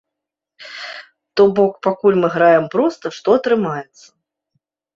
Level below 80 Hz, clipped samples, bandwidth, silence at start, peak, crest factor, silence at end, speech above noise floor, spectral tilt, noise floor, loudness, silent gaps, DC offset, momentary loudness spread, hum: -62 dBFS; under 0.1%; 7.4 kHz; 0.6 s; -2 dBFS; 16 dB; 1.15 s; 67 dB; -6.5 dB/octave; -83 dBFS; -16 LUFS; none; under 0.1%; 18 LU; none